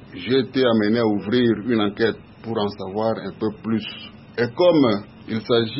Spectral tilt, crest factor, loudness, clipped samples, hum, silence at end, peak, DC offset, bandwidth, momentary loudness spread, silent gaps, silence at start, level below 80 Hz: -10.5 dB/octave; 16 dB; -21 LUFS; under 0.1%; none; 0 s; -4 dBFS; under 0.1%; 5.8 kHz; 11 LU; none; 0 s; -58 dBFS